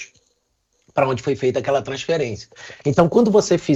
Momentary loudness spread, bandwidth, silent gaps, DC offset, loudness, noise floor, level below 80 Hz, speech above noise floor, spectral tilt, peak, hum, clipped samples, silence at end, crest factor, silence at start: 13 LU; 8.2 kHz; none; under 0.1%; -19 LUFS; -68 dBFS; -54 dBFS; 49 dB; -6 dB/octave; -2 dBFS; none; under 0.1%; 0 s; 18 dB; 0 s